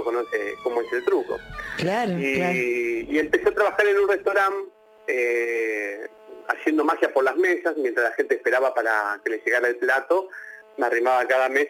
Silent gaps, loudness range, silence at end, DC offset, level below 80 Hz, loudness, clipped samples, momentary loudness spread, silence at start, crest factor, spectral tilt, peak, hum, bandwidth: none; 2 LU; 0 s; under 0.1%; -58 dBFS; -23 LUFS; under 0.1%; 11 LU; 0 s; 18 dB; -5.5 dB/octave; -6 dBFS; none; 16.5 kHz